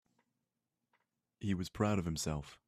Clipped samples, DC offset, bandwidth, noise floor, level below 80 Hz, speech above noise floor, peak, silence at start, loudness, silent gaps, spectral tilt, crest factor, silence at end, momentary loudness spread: under 0.1%; under 0.1%; 14.5 kHz; -89 dBFS; -60 dBFS; 52 dB; -20 dBFS; 1.4 s; -37 LUFS; none; -5.5 dB/octave; 20 dB; 0.1 s; 6 LU